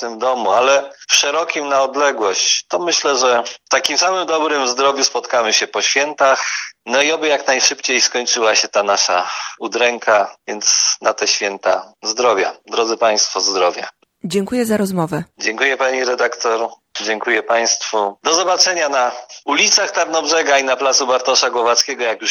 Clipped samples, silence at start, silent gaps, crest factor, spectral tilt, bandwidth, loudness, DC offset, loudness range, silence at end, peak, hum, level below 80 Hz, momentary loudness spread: under 0.1%; 0 s; none; 16 dB; -1 dB/octave; 18 kHz; -15 LUFS; under 0.1%; 3 LU; 0 s; 0 dBFS; none; -66 dBFS; 7 LU